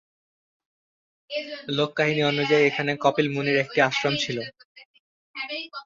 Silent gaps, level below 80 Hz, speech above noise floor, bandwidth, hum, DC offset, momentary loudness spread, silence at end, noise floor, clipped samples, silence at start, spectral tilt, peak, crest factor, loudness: 4.65-4.75 s, 4.85-5.34 s; -68 dBFS; over 66 dB; 7.6 kHz; none; under 0.1%; 13 LU; 0 s; under -90 dBFS; under 0.1%; 1.3 s; -5 dB/octave; -6 dBFS; 20 dB; -24 LUFS